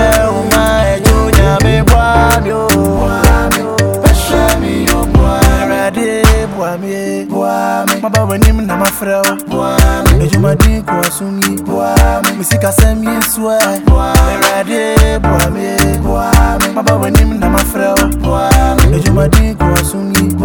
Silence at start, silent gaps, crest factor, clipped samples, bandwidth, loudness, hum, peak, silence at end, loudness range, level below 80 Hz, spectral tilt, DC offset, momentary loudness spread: 0 s; none; 10 dB; 0.6%; over 20 kHz; -11 LUFS; none; 0 dBFS; 0 s; 2 LU; -14 dBFS; -5 dB/octave; under 0.1%; 5 LU